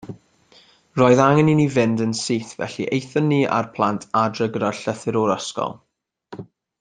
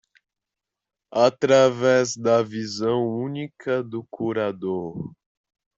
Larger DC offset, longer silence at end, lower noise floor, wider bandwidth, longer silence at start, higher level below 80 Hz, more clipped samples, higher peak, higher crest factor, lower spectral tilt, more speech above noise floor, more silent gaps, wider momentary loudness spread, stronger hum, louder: neither; second, 0.35 s vs 0.65 s; second, -54 dBFS vs -87 dBFS; first, 9.6 kHz vs 7.8 kHz; second, 0.05 s vs 1.1 s; first, -58 dBFS vs -66 dBFS; neither; about the same, -2 dBFS vs -4 dBFS; about the same, 20 dB vs 20 dB; about the same, -6 dB/octave vs -5 dB/octave; second, 35 dB vs 65 dB; neither; about the same, 15 LU vs 14 LU; neither; about the same, -20 LUFS vs -22 LUFS